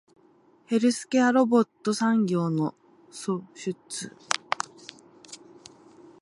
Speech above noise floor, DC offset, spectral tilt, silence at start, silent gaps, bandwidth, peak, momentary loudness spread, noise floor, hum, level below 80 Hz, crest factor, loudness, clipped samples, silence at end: 35 dB; under 0.1%; -5 dB/octave; 0.7 s; none; 11.5 kHz; -4 dBFS; 24 LU; -60 dBFS; none; -76 dBFS; 22 dB; -26 LUFS; under 0.1%; 0.85 s